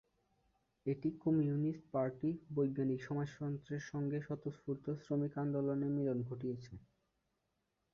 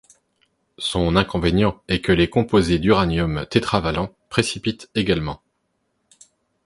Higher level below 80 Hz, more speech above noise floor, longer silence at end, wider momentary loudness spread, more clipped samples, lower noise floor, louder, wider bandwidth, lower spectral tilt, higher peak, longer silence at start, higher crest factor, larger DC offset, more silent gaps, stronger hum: second, -72 dBFS vs -38 dBFS; second, 46 dB vs 51 dB; second, 1.15 s vs 1.3 s; about the same, 8 LU vs 8 LU; neither; first, -84 dBFS vs -71 dBFS; second, -39 LUFS vs -20 LUFS; second, 7 kHz vs 11.5 kHz; first, -9.5 dB/octave vs -6 dB/octave; second, -24 dBFS vs 0 dBFS; about the same, 0.85 s vs 0.8 s; about the same, 16 dB vs 20 dB; neither; neither; neither